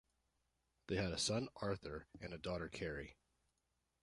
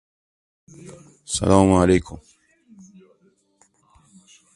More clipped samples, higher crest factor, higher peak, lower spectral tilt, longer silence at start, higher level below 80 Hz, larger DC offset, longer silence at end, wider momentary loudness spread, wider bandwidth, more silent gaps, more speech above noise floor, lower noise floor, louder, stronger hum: neither; about the same, 20 dB vs 24 dB; second, -26 dBFS vs 0 dBFS; second, -4 dB/octave vs -6 dB/octave; about the same, 0.9 s vs 0.85 s; second, -62 dBFS vs -40 dBFS; neither; second, 0.9 s vs 2.4 s; second, 13 LU vs 28 LU; about the same, 11 kHz vs 11.5 kHz; neither; about the same, 42 dB vs 43 dB; first, -86 dBFS vs -62 dBFS; second, -44 LUFS vs -18 LUFS; neither